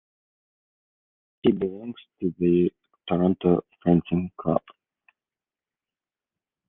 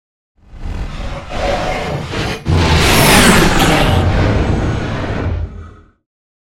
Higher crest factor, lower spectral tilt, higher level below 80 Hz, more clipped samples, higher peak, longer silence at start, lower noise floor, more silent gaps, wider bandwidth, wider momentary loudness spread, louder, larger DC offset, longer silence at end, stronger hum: first, 22 dB vs 14 dB; first, -11.5 dB/octave vs -4.5 dB/octave; second, -62 dBFS vs -22 dBFS; neither; second, -6 dBFS vs 0 dBFS; first, 1.45 s vs 0.5 s; first, under -90 dBFS vs -35 dBFS; neither; second, 3.8 kHz vs 17 kHz; second, 10 LU vs 18 LU; second, -25 LUFS vs -13 LUFS; neither; first, 2.1 s vs 0.8 s; neither